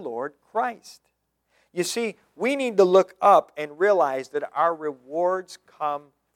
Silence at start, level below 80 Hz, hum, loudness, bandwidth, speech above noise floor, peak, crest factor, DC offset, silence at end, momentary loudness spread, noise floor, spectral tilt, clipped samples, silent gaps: 0 s; -80 dBFS; none; -23 LUFS; 16.5 kHz; 47 dB; -4 dBFS; 20 dB; under 0.1%; 0.35 s; 15 LU; -70 dBFS; -4.5 dB/octave; under 0.1%; none